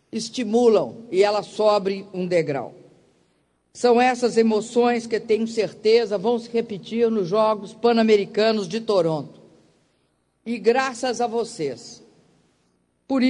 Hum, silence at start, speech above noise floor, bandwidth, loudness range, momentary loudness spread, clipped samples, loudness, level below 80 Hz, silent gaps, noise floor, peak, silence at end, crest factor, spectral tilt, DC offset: none; 0.15 s; 47 dB; 10.5 kHz; 6 LU; 11 LU; under 0.1%; -21 LUFS; -68 dBFS; none; -68 dBFS; -6 dBFS; 0 s; 16 dB; -5 dB/octave; under 0.1%